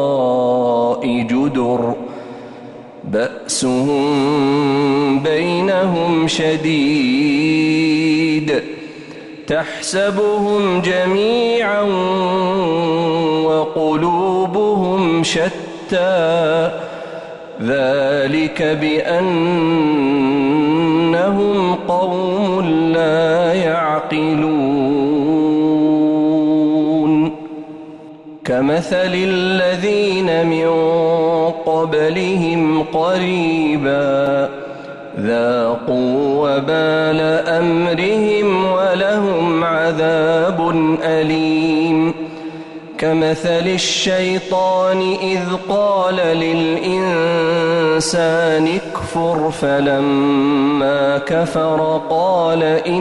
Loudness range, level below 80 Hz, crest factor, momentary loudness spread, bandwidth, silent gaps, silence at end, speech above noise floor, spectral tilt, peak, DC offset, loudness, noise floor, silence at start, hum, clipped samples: 2 LU; -52 dBFS; 10 dB; 6 LU; 11.5 kHz; none; 0 s; 20 dB; -5.5 dB/octave; -6 dBFS; under 0.1%; -16 LUFS; -35 dBFS; 0 s; none; under 0.1%